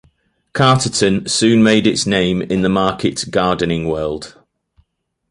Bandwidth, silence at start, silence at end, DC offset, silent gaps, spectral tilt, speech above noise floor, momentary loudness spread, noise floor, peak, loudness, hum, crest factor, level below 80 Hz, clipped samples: 11.5 kHz; 0.55 s; 1 s; under 0.1%; none; -4.5 dB/octave; 52 dB; 10 LU; -67 dBFS; 0 dBFS; -15 LUFS; none; 16 dB; -44 dBFS; under 0.1%